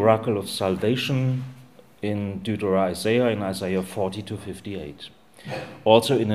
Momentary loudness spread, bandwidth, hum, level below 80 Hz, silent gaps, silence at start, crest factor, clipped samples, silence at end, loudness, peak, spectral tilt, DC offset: 16 LU; 15.5 kHz; none; -58 dBFS; none; 0 s; 24 dB; under 0.1%; 0 s; -24 LUFS; 0 dBFS; -6 dB/octave; 0.2%